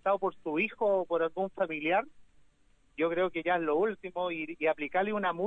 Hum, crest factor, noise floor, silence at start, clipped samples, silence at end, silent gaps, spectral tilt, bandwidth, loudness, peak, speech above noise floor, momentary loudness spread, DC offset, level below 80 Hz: none; 16 dB; -65 dBFS; 0.05 s; under 0.1%; 0 s; none; -7.5 dB/octave; 4 kHz; -31 LUFS; -16 dBFS; 35 dB; 6 LU; under 0.1%; -68 dBFS